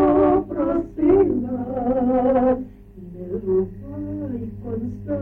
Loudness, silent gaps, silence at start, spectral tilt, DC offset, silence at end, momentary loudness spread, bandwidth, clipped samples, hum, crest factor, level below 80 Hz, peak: -21 LUFS; none; 0 s; -11 dB/octave; under 0.1%; 0 s; 14 LU; 3.5 kHz; under 0.1%; none; 14 dB; -42 dBFS; -6 dBFS